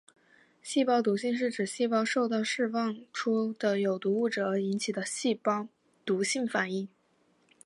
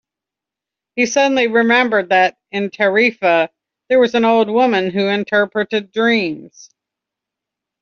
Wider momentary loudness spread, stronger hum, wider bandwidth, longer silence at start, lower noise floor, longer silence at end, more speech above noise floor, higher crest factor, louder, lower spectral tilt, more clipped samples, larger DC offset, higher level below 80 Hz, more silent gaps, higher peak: about the same, 7 LU vs 8 LU; neither; first, 11.5 kHz vs 7.4 kHz; second, 0.65 s vs 0.95 s; second, -69 dBFS vs -86 dBFS; second, 0.8 s vs 1.35 s; second, 40 dB vs 70 dB; about the same, 16 dB vs 14 dB; second, -30 LUFS vs -15 LUFS; first, -4.5 dB/octave vs -2.5 dB/octave; neither; neither; second, -82 dBFS vs -64 dBFS; neither; second, -14 dBFS vs -2 dBFS